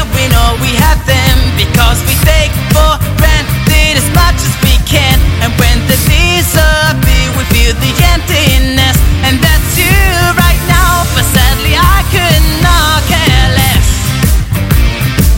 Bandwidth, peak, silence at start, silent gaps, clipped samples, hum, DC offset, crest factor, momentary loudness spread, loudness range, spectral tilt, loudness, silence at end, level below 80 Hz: 17 kHz; 0 dBFS; 0 s; none; 0.4%; none; under 0.1%; 8 dB; 3 LU; 1 LU; -4 dB/octave; -9 LUFS; 0 s; -12 dBFS